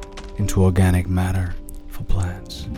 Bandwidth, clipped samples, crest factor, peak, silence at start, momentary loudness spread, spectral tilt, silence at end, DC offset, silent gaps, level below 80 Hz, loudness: 14 kHz; under 0.1%; 16 dB; -4 dBFS; 0 s; 19 LU; -6.5 dB/octave; 0 s; under 0.1%; none; -30 dBFS; -21 LUFS